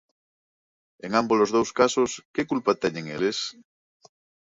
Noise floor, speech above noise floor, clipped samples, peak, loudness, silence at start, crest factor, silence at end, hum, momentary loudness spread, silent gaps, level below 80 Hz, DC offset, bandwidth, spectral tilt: under -90 dBFS; over 66 dB; under 0.1%; -6 dBFS; -24 LUFS; 1.05 s; 20 dB; 0.9 s; none; 9 LU; 2.25-2.34 s; -64 dBFS; under 0.1%; 7.8 kHz; -4 dB/octave